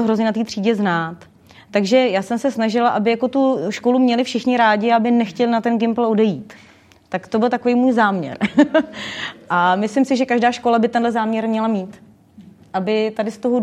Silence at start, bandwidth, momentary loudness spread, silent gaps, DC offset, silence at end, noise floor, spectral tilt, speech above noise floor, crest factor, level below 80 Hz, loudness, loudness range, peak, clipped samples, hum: 0 s; 10 kHz; 8 LU; none; under 0.1%; 0 s; -45 dBFS; -6 dB/octave; 27 dB; 16 dB; -66 dBFS; -18 LUFS; 2 LU; -2 dBFS; under 0.1%; none